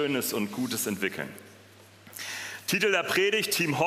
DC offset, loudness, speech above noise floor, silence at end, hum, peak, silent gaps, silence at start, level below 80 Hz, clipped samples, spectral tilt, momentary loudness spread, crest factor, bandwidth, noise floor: under 0.1%; -27 LUFS; 25 dB; 0 s; none; -10 dBFS; none; 0 s; -74 dBFS; under 0.1%; -3 dB/octave; 15 LU; 18 dB; 16 kHz; -53 dBFS